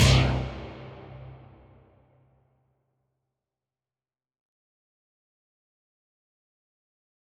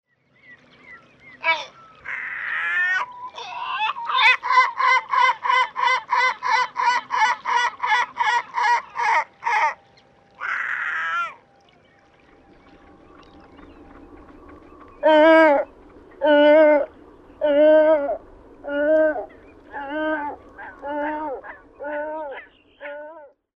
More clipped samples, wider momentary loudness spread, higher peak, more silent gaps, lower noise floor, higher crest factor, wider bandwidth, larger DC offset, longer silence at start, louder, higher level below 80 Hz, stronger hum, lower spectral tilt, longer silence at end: neither; first, 25 LU vs 21 LU; second, -8 dBFS vs -2 dBFS; neither; first, under -90 dBFS vs -55 dBFS; about the same, 24 dB vs 20 dB; first, 13.5 kHz vs 8.6 kHz; neither; second, 0 s vs 0.5 s; second, -25 LUFS vs -20 LUFS; first, -40 dBFS vs -58 dBFS; neither; first, -5 dB/octave vs -2.5 dB/octave; first, 6.05 s vs 0.3 s